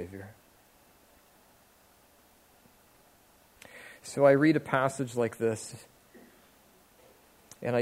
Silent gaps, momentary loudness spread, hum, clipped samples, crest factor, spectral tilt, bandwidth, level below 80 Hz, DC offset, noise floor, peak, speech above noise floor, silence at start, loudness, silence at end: none; 26 LU; none; under 0.1%; 24 dB; -6 dB/octave; 16 kHz; -72 dBFS; under 0.1%; -62 dBFS; -10 dBFS; 34 dB; 0 s; -27 LUFS; 0 s